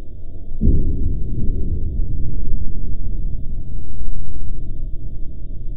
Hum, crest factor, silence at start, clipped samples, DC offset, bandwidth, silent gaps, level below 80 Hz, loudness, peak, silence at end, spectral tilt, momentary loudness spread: none; 10 dB; 0 s; under 0.1%; under 0.1%; 0.7 kHz; none; -20 dBFS; -27 LUFS; -2 dBFS; 0 s; -14 dB/octave; 13 LU